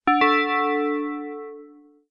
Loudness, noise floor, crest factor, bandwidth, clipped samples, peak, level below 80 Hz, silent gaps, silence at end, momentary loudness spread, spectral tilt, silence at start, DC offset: -22 LUFS; -49 dBFS; 16 dB; 6.4 kHz; under 0.1%; -8 dBFS; -64 dBFS; none; 0.45 s; 18 LU; -4.5 dB/octave; 0.05 s; under 0.1%